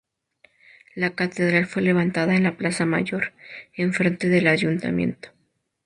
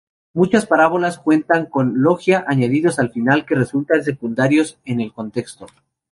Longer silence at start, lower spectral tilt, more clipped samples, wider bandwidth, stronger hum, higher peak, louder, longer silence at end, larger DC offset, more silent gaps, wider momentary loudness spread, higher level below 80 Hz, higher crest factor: first, 0.95 s vs 0.35 s; about the same, -6 dB/octave vs -6.5 dB/octave; neither; about the same, 10.5 kHz vs 11.5 kHz; neither; about the same, -4 dBFS vs -2 dBFS; second, -22 LUFS vs -17 LUFS; first, 0.6 s vs 0.45 s; neither; neither; about the same, 9 LU vs 10 LU; about the same, -60 dBFS vs -58 dBFS; about the same, 18 dB vs 16 dB